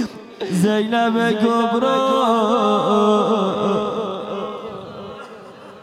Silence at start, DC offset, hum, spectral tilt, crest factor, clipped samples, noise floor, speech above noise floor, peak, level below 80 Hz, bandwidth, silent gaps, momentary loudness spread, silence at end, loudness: 0 s; under 0.1%; none; -6 dB/octave; 14 dB; under 0.1%; -39 dBFS; 22 dB; -4 dBFS; -64 dBFS; 13 kHz; none; 17 LU; 0 s; -18 LUFS